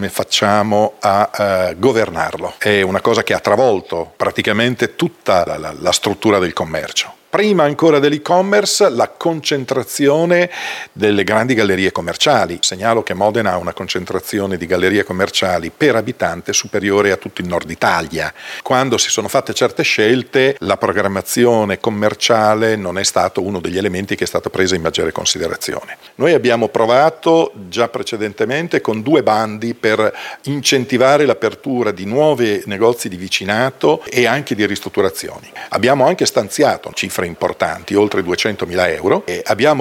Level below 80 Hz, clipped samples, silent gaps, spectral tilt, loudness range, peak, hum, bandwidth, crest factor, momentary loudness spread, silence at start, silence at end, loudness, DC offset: -52 dBFS; under 0.1%; none; -4 dB/octave; 2 LU; 0 dBFS; none; 17 kHz; 14 dB; 8 LU; 0 s; 0 s; -15 LUFS; under 0.1%